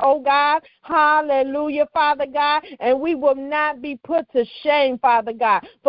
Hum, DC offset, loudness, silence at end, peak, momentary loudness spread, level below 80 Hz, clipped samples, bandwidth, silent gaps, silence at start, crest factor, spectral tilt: none; under 0.1%; -19 LUFS; 0 s; -4 dBFS; 6 LU; -60 dBFS; under 0.1%; 5.6 kHz; none; 0 s; 16 dB; -8 dB/octave